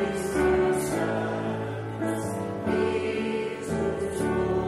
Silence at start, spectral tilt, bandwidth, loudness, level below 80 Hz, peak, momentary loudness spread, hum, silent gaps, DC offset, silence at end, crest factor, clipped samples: 0 s; -6 dB/octave; 13.5 kHz; -27 LUFS; -48 dBFS; -12 dBFS; 7 LU; none; none; under 0.1%; 0 s; 16 dB; under 0.1%